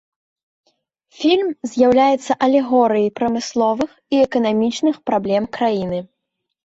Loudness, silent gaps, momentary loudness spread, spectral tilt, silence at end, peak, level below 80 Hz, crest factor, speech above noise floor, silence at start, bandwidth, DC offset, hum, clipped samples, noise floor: -18 LUFS; none; 6 LU; -5.5 dB/octave; 0.6 s; -2 dBFS; -56 dBFS; 16 dB; 60 dB; 1.2 s; 8 kHz; under 0.1%; none; under 0.1%; -77 dBFS